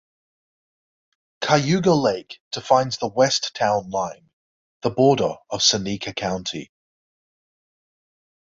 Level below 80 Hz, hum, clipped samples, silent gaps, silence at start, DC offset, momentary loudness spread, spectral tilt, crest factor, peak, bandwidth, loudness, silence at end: -58 dBFS; none; under 0.1%; 2.40-2.51 s, 4.33-4.81 s; 1.4 s; under 0.1%; 13 LU; -4 dB/octave; 22 dB; -2 dBFS; 7.8 kHz; -21 LUFS; 1.9 s